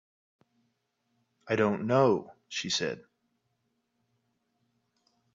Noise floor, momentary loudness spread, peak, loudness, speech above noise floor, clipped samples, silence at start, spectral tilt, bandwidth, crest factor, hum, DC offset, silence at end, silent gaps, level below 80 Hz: -78 dBFS; 12 LU; -10 dBFS; -29 LUFS; 50 dB; under 0.1%; 1.45 s; -4.5 dB/octave; 7.8 kHz; 22 dB; none; under 0.1%; 2.35 s; none; -72 dBFS